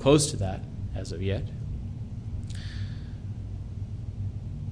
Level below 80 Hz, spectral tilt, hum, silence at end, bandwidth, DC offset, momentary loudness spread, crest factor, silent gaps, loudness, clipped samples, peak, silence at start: -40 dBFS; -5.5 dB/octave; none; 0 s; 10.5 kHz; under 0.1%; 9 LU; 22 dB; none; -32 LUFS; under 0.1%; -8 dBFS; 0 s